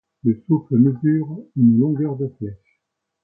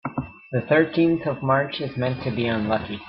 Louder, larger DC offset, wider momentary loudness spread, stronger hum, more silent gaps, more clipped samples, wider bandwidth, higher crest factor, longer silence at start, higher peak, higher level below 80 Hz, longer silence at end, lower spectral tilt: first, -19 LUFS vs -23 LUFS; neither; first, 12 LU vs 9 LU; neither; neither; neither; second, 2.3 kHz vs 5.6 kHz; about the same, 16 dB vs 18 dB; first, 0.25 s vs 0.05 s; about the same, -4 dBFS vs -6 dBFS; about the same, -58 dBFS vs -54 dBFS; first, 0.7 s vs 0 s; first, -15 dB/octave vs -11 dB/octave